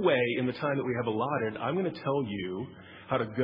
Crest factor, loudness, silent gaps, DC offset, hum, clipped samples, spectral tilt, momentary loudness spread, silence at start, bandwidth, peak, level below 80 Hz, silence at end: 18 dB; -31 LUFS; none; under 0.1%; none; under 0.1%; -9.5 dB/octave; 9 LU; 0 s; 5.4 kHz; -12 dBFS; -68 dBFS; 0 s